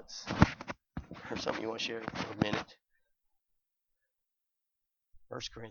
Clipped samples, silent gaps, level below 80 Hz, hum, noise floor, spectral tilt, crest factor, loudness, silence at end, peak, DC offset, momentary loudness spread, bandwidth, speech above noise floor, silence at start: under 0.1%; none; -52 dBFS; none; -87 dBFS; -5.5 dB/octave; 30 dB; -35 LUFS; 0 s; -8 dBFS; under 0.1%; 16 LU; 7.2 kHz; 49 dB; 0 s